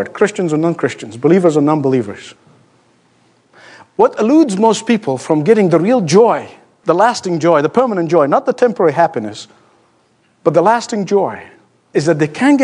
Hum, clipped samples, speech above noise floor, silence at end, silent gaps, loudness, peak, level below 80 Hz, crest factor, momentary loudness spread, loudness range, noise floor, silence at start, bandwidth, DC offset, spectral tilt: none; under 0.1%; 43 dB; 0 s; none; -13 LUFS; 0 dBFS; -66 dBFS; 14 dB; 10 LU; 4 LU; -56 dBFS; 0 s; 10.5 kHz; under 0.1%; -6 dB/octave